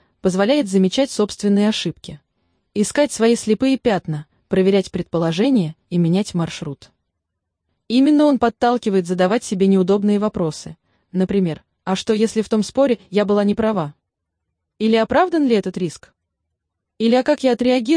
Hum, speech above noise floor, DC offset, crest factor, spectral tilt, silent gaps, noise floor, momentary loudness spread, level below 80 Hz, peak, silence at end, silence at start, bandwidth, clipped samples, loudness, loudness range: none; 60 dB; under 0.1%; 14 dB; -6 dB/octave; none; -78 dBFS; 11 LU; -52 dBFS; -4 dBFS; 0 s; 0.25 s; 10.5 kHz; under 0.1%; -18 LUFS; 3 LU